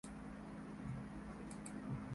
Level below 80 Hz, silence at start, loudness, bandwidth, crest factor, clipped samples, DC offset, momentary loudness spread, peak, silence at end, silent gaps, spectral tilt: -62 dBFS; 0.05 s; -50 LUFS; 11.5 kHz; 16 dB; under 0.1%; under 0.1%; 4 LU; -34 dBFS; 0 s; none; -6.5 dB/octave